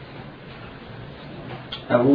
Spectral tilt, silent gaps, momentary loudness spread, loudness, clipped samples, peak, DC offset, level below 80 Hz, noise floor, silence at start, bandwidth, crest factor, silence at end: -9.5 dB/octave; none; 17 LU; -30 LUFS; under 0.1%; -4 dBFS; under 0.1%; -52 dBFS; -40 dBFS; 0 s; 5.2 kHz; 20 dB; 0 s